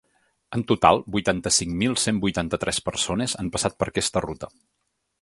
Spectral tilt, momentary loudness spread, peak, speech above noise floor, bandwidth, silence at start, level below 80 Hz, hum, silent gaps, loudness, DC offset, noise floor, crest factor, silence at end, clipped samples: -3.5 dB/octave; 11 LU; 0 dBFS; 52 dB; 11.5 kHz; 0.5 s; -46 dBFS; none; none; -23 LUFS; under 0.1%; -76 dBFS; 24 dB; 0.75 s; under 0.1%